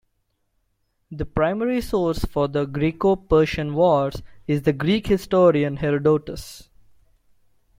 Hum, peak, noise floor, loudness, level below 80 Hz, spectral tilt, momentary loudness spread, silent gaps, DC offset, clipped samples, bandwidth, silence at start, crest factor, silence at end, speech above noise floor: none; -4 dBFS; -71 dBFS; -21 LUFS; -40 dBFS; -7 dB/octave; 13 LU; none; under 0.1%; under 0.1%; 16.5 kHz; 1.1 s; 18 dB; 1.15 s; 50 dB